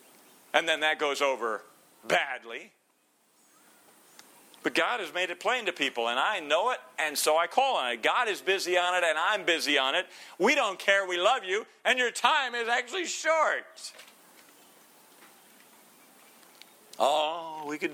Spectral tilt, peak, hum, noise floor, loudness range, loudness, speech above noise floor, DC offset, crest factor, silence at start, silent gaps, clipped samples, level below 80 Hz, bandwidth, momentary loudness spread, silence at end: -1 dB/octave; -6 dBFS; none; -69 dBFS; 9 LU; -27 LUFS; 41 dB; under 0.1%; 24 dB; 0.55 s; none; under 0.1%; -86 dBFS; 17 kHz; 9 LU; 0 s